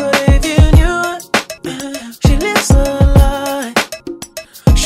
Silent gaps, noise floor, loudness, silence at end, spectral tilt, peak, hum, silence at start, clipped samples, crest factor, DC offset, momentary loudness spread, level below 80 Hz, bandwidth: none; -31 dBFS; -13 LUFS; 0 s; -5 dB/octave; 0 dBFS; none; 0 s; 0.2%; 12 dB; under 0.1%; 15 LU; -16 dBFS; 16 kHz